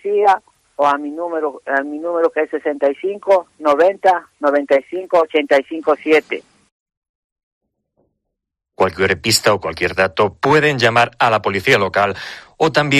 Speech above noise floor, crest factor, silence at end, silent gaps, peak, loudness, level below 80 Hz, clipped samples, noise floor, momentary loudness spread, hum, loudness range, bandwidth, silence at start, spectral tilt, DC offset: 63 dB; 16 dB; 0 s; 6.72-6.86 s, 6.97-7.02 s, 7.09-7.36 s, 7.43-7.61 s; 0 dBFS; -16 LUFS; -54 dBFS; under 0.1%; -79 dBFS; 8 LU; none; 6 LU; 13 kHz; 0.05 s; -4 dB/octave; under 0.1%